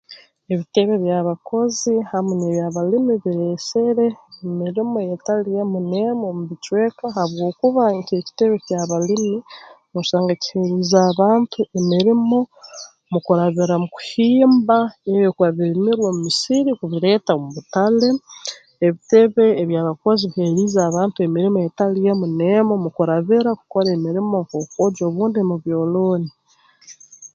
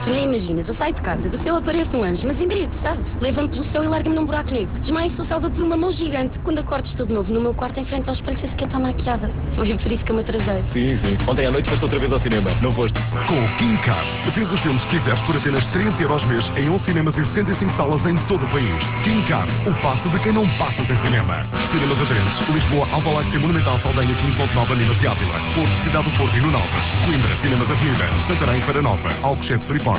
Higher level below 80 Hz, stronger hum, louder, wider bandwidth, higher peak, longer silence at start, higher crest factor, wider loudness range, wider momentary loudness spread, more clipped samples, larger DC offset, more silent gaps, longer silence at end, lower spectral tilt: second, -64 dBFS vs -30 dBFS; neither; about the same, -18 LUFS vs -20 LUFS; first, 9 kHz vs 4 kHz; first, -2 dBFS vs -6 dBFS; about the same, 0.1 s vs 0 s; about the same, 16 dB vs 14 dB; about the same, 4 LU vs 4 LU; first, 9 LU vs 5 LU; neither; neither; neither; about the same, 0.05 s vs 0 s; second, -6 dB/octave vs -11 dB/octave